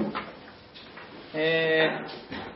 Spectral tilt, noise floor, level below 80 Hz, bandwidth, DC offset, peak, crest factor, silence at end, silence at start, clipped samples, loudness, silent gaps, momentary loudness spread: -9 dB/octave; -47 dBFS; -64 dBFS; 5.8 kHz; under 0.1%; -10 dBFS; 18 dB; 0 s; 0 s; under 0.1%; -27 LUFS; none; 23 LU